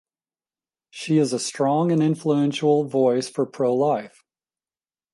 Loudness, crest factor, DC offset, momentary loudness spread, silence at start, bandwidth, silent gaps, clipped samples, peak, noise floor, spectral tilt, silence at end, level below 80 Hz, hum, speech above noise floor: -22 LUFS; 16 dB; under 0.1%; 4 LU; 0.95 s; 11.5 kHz; none; under 0.1%; -8 dBFS; under -90 dBFS; -6 dB/octave; 1.05 s; -72 dBFS; none; over 69 dB